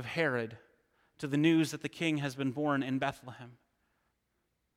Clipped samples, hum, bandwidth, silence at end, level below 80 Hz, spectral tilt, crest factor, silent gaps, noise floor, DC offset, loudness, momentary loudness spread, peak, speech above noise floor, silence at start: under 0.1%; none; 15.5 kHz; 1.25 s; -74 dBFS; -6 dB/octave; 18 dB; none; -80 dBFS; under 0.1%; -32 LUFS; 16 LU; -16 dBFS; 48 dB; 0 s